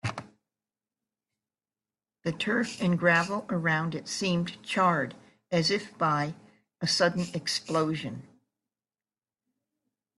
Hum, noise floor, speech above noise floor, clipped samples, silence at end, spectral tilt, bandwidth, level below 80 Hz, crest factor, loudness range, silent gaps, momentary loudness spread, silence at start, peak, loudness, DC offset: none; under -90 dBFS; over 62 dB; under 0.1%; 2 s; -4.5 dB/octave; 12 kHz; -68 dBFS; 20 dB; 4 LU; none; 11 LU; 0.05 s; -10 dBFS; -28 LUFS; under 0.1%